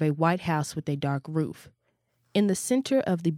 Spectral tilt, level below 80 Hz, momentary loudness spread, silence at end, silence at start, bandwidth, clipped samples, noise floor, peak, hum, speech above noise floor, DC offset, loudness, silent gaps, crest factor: -6 dB/octave; -64 dBFS; 6 LU; 0 s; 0 s; 16 kHz; under 0.1%; -73 dBFS; -10 dBFS; none; 47 dB; under 0.1%; -27 LUFS; none; 18 dB